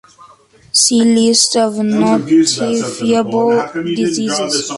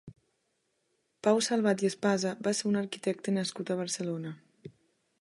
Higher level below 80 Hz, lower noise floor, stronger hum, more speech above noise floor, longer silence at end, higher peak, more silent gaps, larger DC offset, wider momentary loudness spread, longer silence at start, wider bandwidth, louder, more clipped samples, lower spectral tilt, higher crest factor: first, -56 dBFS vs -76 dBFS; second, -45 dBFS vs -77 dBFS; neither; second, 32 dB vs 48 dB; second, 0 s vs 0.5 s; first, 0 dBFS vs -12 dBFS; neither; neither; about the same, 7 LU vs 8 LU; first, 0.2 s vs 0.05 s; about the same, 11.5 kHz vs 11.5 kHz; first, -13 LUFS vs -30 LUFS; neither; second, -3 dB/octave vs -4.5 dB/octave; second, 14 dB vs 20 dB